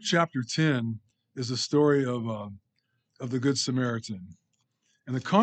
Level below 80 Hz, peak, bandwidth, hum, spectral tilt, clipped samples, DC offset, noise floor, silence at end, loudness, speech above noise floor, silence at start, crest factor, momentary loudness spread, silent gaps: -76 dBFS; -8 dBFS; 9.2 kHz; none; -5 dB/octave; under 0.1%; under 0.1%; -76 dBFS; 0 s; -28 LUFS; 50 dB; 0 s; 22 dB; 17 LU; none